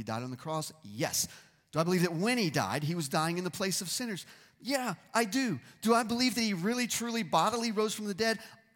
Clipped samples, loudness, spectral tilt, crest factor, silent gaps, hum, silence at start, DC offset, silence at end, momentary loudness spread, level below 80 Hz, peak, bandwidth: under 0.1%; -31 LUFS; -4 dB/octave; 18 dB; none; none; 0 s; under 0.1%; 0.2 s; 9 LU; -72 dBFS; -14 dBFS; 17.5 kHz